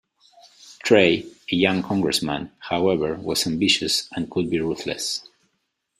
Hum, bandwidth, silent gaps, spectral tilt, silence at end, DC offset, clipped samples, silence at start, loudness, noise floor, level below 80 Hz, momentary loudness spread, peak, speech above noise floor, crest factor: none; 15.5 kHz; none; -4 dB/octave; 0.8 s; under 0.1%; under 0.1%; 0.65 s; -22 LUFS; -74 dBFS; -56 dBFS; 10 LU; -2 dBFS; 52 dB; 22 dB